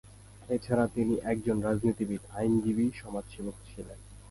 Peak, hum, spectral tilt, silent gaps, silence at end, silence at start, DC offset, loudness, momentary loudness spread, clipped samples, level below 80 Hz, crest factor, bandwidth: -12 dBFS; none; -7.5 dB/octave; none; 0 s; 0.05 s; under 0.1%; -31 LUFS; 18 LU; under 0.1%; -52 dBFS; 18 dB; 11.5 kHz